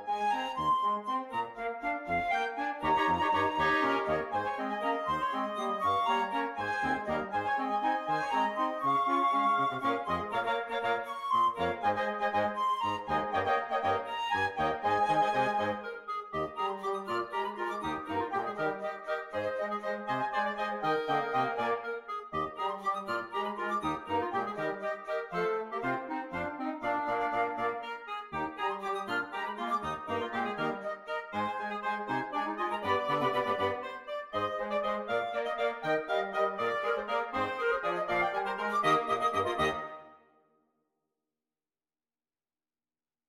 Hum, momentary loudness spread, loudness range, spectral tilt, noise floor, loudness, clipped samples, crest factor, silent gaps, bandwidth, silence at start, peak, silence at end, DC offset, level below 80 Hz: none; 8 LU; 4 LU; -5 dB/octave; under -90 dBFS; -32 LUFS; under 0.1%; 16 dB; none; 15.5 kHz; 0 s; -16 dBFS; 3.15 s; under 0.1%; -66 dBFS